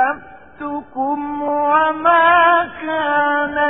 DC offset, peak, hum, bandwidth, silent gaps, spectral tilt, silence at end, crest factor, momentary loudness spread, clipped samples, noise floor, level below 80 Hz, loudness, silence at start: 0.4%; -2 dBFS; none; 3.9 kHz; none; -9 dB/octave; 0 s; 14 dB; 16 LU; under 0.1%; -36 dBFS; -56 dBFS; -16 LUFS; 0 s